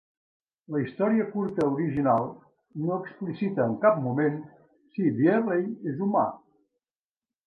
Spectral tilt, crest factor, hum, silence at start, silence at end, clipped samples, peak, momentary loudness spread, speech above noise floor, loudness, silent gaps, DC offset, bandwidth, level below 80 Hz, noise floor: -10 dB/octave; 20 dB; none; 0.7 s; 1.1 s; under 0.1%; -8 dBFS; 10 LU; over 64 dB; -27 LUFS; none; under 0.1%; 6 kHz; -68 dBFS; under -90 dBFS